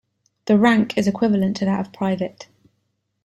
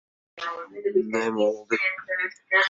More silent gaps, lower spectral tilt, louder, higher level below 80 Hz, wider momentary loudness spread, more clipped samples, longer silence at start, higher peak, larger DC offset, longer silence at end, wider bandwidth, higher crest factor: neither; first, -6.5 dB/octave vs -4 dB/octave; first, -20 LUFS vs -26 LUFS; first, -58 dBFS vs -74 dBFS; about the same, 11 LU vs 10 LU; neither; about the same, 0.45 s vs 0.35 s; first, -4 dBFS vs -8 dBFS; neither; first, 0.8 s vs 0 s; first, 12 kHz vs 7.8 kHz; about the same, 16 dB vs 18 dB